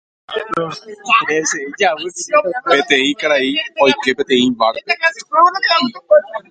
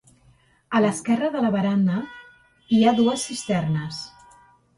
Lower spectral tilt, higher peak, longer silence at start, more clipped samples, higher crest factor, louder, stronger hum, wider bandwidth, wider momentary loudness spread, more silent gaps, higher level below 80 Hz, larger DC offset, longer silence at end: second, -2.5 dB/octave vs -5.5 dB/octave; first, 0 dBFS vs -6 dBFS; second, 0.3 s vs 0.7 s; neither; about the same, 16 dB vs 18 dB; first, -15 LUFS vs -22 LUFS; neither; second, 9.4 kHz vs 11.5 kHz; second, 9 LU vs 13 LU; neither; about the same, -60 dBFS vs -60 dBFS; neither; second, 0.1 s vs 0.7 s